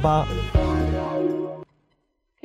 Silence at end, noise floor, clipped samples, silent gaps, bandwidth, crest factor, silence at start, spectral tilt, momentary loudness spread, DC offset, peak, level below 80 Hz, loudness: 0.8 s; -71 dBFS; under 0.1%; none; 10.5 kHz; 16 dB; 0 s; -8 dB/octave; 10 LU; under 0.1%; -8 dBFS; -30 dBFS; -24 LUFS